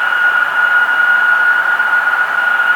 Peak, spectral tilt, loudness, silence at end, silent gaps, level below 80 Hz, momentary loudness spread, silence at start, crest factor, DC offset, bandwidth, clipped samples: -2 dBFS; -0.5 dB/octave; -11 LUFS; 0 s; none; -68 dBFS; 3 LU; 0 s; 10 dB; under 0.1%; 19 kHz; under 0.1%